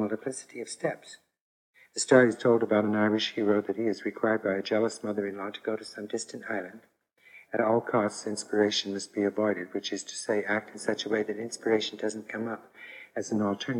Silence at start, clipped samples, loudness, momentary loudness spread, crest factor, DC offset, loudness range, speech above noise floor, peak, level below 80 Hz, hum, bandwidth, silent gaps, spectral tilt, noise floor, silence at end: 0 s; under 0.1%; -29 LUFS; 12 LU; 24 dB; under 0.1%; 6 LU; 28 dB; -6 dBFS; -82 dBFS; none; 11.5 kHz; 1.41-1.73 s; -4 dB/octave; -56 dBFS; 0 s